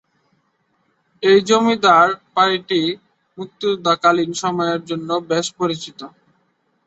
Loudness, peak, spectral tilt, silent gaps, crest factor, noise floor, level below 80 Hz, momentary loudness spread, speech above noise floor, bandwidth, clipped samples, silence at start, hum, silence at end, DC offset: -17 LUFS; -2 dBFS; -4 dB/octave; none; 18 dB; -65 dBFS; -64 dBFS; 15 LU; 48 dB; 8.2 kHz; under 0.1%; 1.2 s; none; 0.8 s; under 0.1%